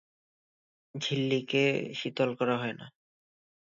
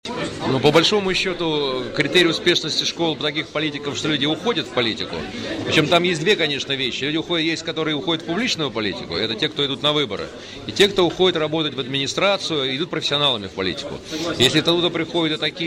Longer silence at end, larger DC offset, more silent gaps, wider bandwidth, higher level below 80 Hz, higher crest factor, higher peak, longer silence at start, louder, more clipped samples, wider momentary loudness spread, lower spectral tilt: first, 0.75 s vs 0 s; neither; neither; second, 7.6 kHz vs 16 kHz; second, -76 dBFS vs -50 dBFS; about the same, 18 dB vs 16 dB; second, -14 dBFS vs -4 dBFS; first, 0.95 s vs 0.05 s; second, -30 LUFS vs -20 LUFS; neither; about the same, 10 LU vs 9 LU; first, -5.5 dB/octave vs -4 dB/octave